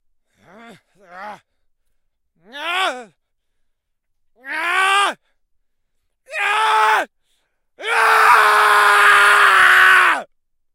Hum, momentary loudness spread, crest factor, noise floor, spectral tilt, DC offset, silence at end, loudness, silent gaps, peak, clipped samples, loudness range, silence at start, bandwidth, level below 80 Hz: none; 19 LU; 18 dB; -70 dBFS; 0.5 dB/octave; under 0.1%; 0.5 s; -13 LUFS; none; 0 dBFS; under 0.1%; 17 LU; 1.15 s; 16 kHz; -62 dBFS